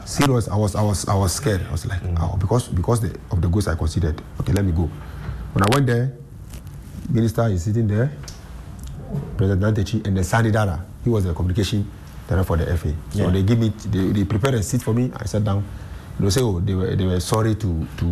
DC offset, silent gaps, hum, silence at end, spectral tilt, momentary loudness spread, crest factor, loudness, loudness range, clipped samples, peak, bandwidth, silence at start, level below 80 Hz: 0.2%; none; none; 0 s; -6.5 dB/octave; 14 LU; 16 dB; -21 LUFS; 2 LU; under 0.1%; -4 dBFS; 14 kHz; 0 s; -34 dBFS